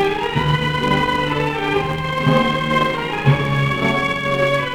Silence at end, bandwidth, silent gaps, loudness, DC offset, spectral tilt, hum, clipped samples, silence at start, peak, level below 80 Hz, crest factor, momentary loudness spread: 0 s; 17 kHz; none; -18 LUFS; under 0.1%; -6 dB/octave; none; under 0.1%; 0 s; -2 dBFS; -38 dBFS; 16 dB; 3 LU